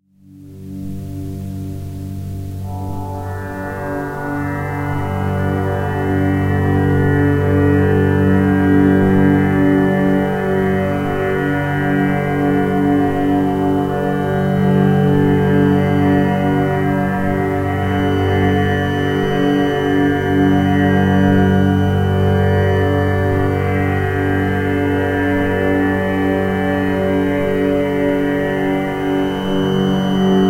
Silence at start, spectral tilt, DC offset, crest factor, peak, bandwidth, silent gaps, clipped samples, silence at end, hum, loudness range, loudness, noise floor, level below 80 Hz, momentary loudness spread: 0.35 s; -8 dB/octave; 0.3%; 14 dB; -2 dBFS; 16 kHz; none; under 0.1%; 0 s; none; 8 LU; -16 LUFS; -41 dBFS; -38 dBFS; 12 LU